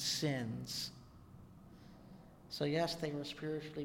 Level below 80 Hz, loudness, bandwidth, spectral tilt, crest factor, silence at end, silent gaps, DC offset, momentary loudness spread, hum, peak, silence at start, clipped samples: -66 dBFS; -40 LUFS; 16.5 kHz; -4 dB/octave; 18 dB; 0 s; none; under 0.1%; 23 LU; none; -24 dBFS; 0 s; under 0.1%